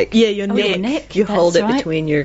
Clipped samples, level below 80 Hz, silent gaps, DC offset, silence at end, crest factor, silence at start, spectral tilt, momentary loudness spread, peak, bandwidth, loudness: under 0.1%; -44 dBFS; none; under 0.1%; 0 s; 14 dB; 0 s; -4.5 dB/octave; 5 LU; -2 dBFS; 8 kHz; -16 LUFS